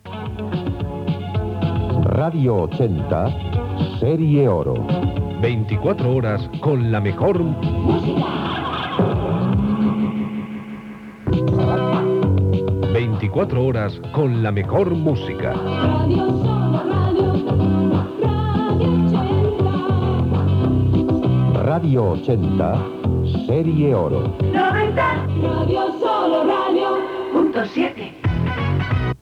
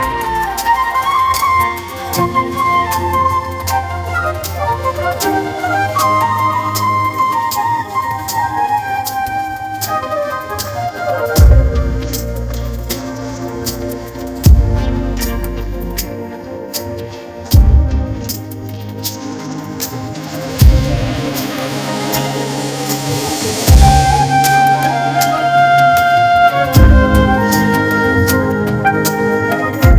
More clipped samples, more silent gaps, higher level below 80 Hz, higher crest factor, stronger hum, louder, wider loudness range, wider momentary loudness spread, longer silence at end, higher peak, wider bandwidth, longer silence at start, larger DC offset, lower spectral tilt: second, under 0.1% vs 0.6%; neither; second, -38 dBFS vs -18 dBFS; about the same, 12 dB vs 14 dB; neither; second, -19 LUFS vs -14 LUFS; second, 2 LU vs 7 LU; second, 6 LU vs 13 LU; about the same, 0.05 s vs 0 s; second, -6 dBFS vs 0 dBFS; second, 5.8 kHz vs 16 kHz; about the same, 0.05 s vs 0 s; neither; first, -9.5 dB/octave vs -5 dB/octave